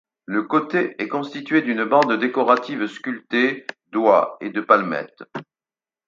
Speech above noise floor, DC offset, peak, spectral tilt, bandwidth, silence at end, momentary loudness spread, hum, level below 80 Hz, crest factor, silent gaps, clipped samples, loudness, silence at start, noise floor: over 70 dB; under 0.1%; 0 dBFS; -6 dB/octave; 7.6 kHz; 0.65 s; 13 LU; none; -74 dBFS; 20 dB; none; under 0.1%; -20 LUFS; 0.3 s; under -90 dBFS